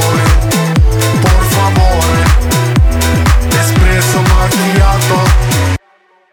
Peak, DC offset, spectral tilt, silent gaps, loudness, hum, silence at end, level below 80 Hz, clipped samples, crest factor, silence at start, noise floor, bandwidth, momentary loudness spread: 0 dBFS; under 0.1%; -5 dB/octave; none; -10 LUFS; none; 0.55 s; -14 dBFS; under 0.1%; 8 dB; 0 s; -49 dBFS; 18.5 kHz; 2 LU